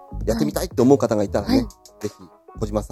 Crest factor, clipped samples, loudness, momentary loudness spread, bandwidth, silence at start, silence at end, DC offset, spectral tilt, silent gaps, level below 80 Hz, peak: 20 dB; under 0.1%; -21 LUFS; 17 LU; 15 kHz; 0 s; 0.05 s; under 0.1%; -6.5 dB/octave; none; -36 dBFS; 0 dBFS